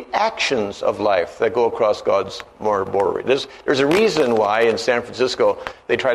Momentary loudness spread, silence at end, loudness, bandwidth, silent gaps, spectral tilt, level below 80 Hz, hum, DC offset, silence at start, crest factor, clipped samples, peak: 6 LU; 0 s; -19 LUFS; 13 kHz; none; -4 dB/octave; -54 dBFS; none; under 0.1%; 0 s; 16 dB; under 0.1%; -2 dBFS